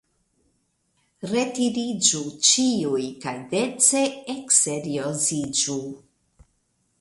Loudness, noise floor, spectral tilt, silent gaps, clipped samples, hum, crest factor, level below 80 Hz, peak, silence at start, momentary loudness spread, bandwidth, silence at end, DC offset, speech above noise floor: -21 LUFS; -70 dBFS; -2.5 dB/octave; none; under 0.1%; none; 22 dB; -64 dBFS; -4 dBFS; 1.2 s; 13 LU; 11.5 kHz; 1 s; under 0.1%; 47 dB